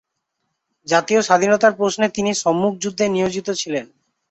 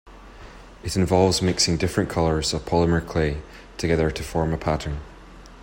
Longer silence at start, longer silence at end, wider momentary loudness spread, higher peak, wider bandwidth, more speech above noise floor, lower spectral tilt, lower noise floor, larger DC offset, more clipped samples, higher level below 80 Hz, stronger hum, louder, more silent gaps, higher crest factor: first, 0.85 s vs 0.05 s; first, 0.45 s vs 0 s; second, 8 LU vs 12 LU; about the same, -2 dBFS vs -4 dBFS; second, 8.2 kHz vs 16.5 kHz; first, 57 dB vs 22 dB; about the same, -4 dB/octave vs -5 dB/octave; first, -75 dBFS vs -44 dBFS; neither; neither; second, -60 dBFS vs -38 dBFS; neither; first, -18 LUFS vs -23 LUFS; neither; about the same, 18 dB vs 18 dB